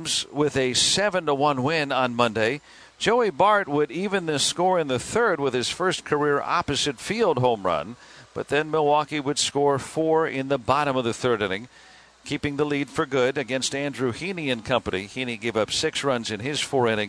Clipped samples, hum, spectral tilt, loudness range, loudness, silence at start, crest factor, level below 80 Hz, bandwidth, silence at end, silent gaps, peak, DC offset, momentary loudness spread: under 0.1%; none; -3.5 dB/octave; 3 LU; -23 LUFS; 0 s; 20 dB; -56 dBFS; 11 kHz; 0 s; none; -4 dBFS; under 0.1%; 7 LU